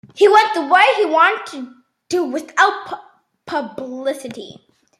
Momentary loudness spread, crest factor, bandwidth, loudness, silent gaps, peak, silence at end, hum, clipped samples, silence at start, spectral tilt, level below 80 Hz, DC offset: 20 LU; 16 dB; 13.5 kHz; -16 LUFS; none; -2 dBFS; 0.45 s; none; under 0.1%; 0.15 s; -2.5 dB/octave; -72 dBFS; under 0.1%